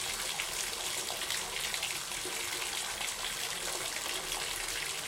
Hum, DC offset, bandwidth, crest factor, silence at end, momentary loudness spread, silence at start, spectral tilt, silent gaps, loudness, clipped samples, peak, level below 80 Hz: none; under 0.1%; 17 kHz; 20 dB; 0 s; 1 LU; 0 s; 0.5 dB/octave; none; -34 LUFS; under 0.1%; -16 dBFS; -58 dBFS